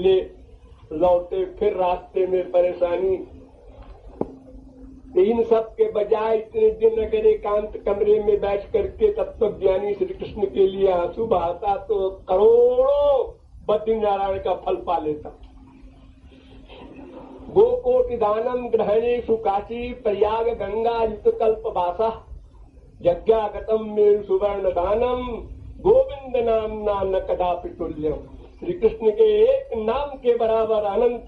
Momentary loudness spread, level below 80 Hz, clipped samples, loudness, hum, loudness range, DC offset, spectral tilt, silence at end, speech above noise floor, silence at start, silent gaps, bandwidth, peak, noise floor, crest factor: 10 LU; -44 dBFS; under 0.1%; -21 LUFS; none; 4 LU; under 0.1%; -8.5 dB/octave; 0 s; 26 dB; 0 s; none; 4.7 kHz; -6 dBFS; -47 dBFS; 16 dB